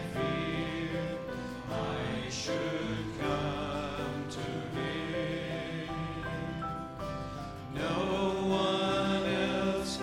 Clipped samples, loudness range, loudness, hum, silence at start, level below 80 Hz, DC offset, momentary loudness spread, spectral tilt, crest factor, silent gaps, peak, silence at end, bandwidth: under 0.1%; 5 LU; -34 LUFS; none; 0 s; -52 dBFS; under 0.1%; 9 LU; -5.5 dB/octave; 16 dB; none; -18 dBFS; 0 s; 16 kHz